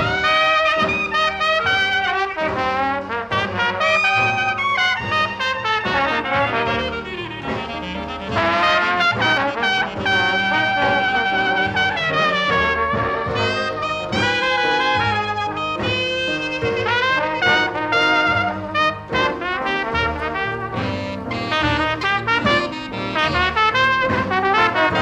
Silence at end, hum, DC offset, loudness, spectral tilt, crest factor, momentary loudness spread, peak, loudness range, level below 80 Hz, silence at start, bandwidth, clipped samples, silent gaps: 0 s; none; under 0.1%; -18 LUFS; -4.5 dB/octave; 16 dB; 8 LU; -4 dBFS; 3 LU; -42 dBFS; 0 s; 13.5 kHz; under 0.1%; none